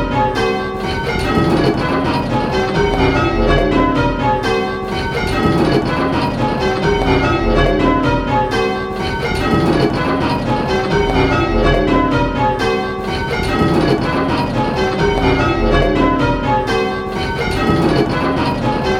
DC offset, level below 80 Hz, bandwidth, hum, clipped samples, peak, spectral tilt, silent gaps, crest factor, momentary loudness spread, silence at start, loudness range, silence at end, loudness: under 0.1%; -26 dBFS; 14.5 kHz; none; under 0.1%; 0 dBFS; -6.5 dB/octave; none; 14 dB; 5 LU; 0 s; 1 LU; 0 s; -15 LUFS